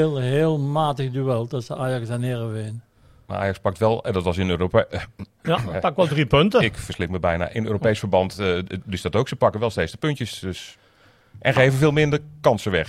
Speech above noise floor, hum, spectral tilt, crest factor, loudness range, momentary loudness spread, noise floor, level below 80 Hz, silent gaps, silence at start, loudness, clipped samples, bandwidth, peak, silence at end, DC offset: 34 dB; none; -6.5 dB/octave; 18 dB; 4 LU; 12 LU; -56 dBFS; -46 dBFS; none; 0 s; -22 LUFS; under 0.1%; 14 kHz; -4 dBFS; 0 s; under 0.1%